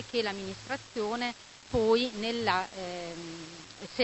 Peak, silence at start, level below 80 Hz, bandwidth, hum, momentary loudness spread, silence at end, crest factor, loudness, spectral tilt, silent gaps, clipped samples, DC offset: -10 dBFS; 0 s; -56 dBFS; 8.4 kHz; none; 16 LU; 0 s; 22 dB; -32 LUFS; -4 dB/octave; none; under 0.1%; under 0.1%